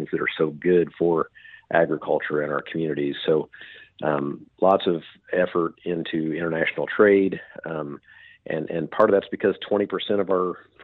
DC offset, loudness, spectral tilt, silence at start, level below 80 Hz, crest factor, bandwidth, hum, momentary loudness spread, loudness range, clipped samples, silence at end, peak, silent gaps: under 0.1%; -24 LUFS; -9 dB/octave; 0 s; -64 dBFS; 20 dB; 4.4 kHz; none; 12 LU; 2 LU; under 0.1%; 0 s; -4 dBFS; none